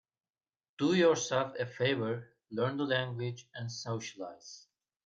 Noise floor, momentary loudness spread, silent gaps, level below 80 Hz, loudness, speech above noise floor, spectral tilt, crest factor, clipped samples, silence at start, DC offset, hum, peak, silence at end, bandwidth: under -90 dBFS; 18 LU; none; -76 dBFS; -33 LUFS; over 57 dB; -5 dB/octave; 18 dB; under 0.1%; 0.8 s; under 0.1%; none; -16 dBFS; 0.45 s; 7.8 kHz